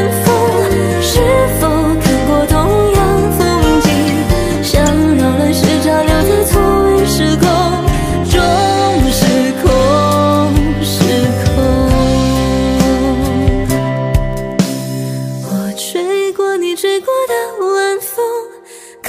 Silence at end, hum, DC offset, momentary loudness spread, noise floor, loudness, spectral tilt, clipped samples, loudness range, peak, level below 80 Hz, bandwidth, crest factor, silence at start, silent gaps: 0 s; none; under 0.1%; 6 LU; -35 dBFS; -12 LUFS; -5.5 dB/octave; under 0.1%; 5 LU; 0 dBFS; -22 dBFS; 16 kHz; 12 dB; 0 s; none